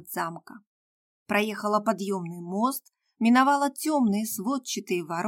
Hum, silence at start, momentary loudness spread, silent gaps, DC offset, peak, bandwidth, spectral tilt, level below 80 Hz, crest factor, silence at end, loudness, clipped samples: none; 0 s; 12 LU; 0.67-1.26 s; under 0.1%; -8 dBFS; 17 kHz; -4.5 dB/octave; -74 dBFS; 18 dB; 0 s; -26 LUFS; under 0.1%